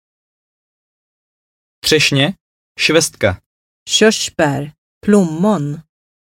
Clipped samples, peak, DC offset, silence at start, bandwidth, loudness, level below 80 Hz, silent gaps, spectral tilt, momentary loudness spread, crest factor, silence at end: under 0.1%; 0 dBFS; under 0.1%; 1.85 s; 16.5 kHz; -15 LUFS; -50 dBFS; 2.41-2.75 s, 3.46-3.86 s, 4.78-5.01 s; -4 dB/octave; 13 LU; 18 dB; 0.4 s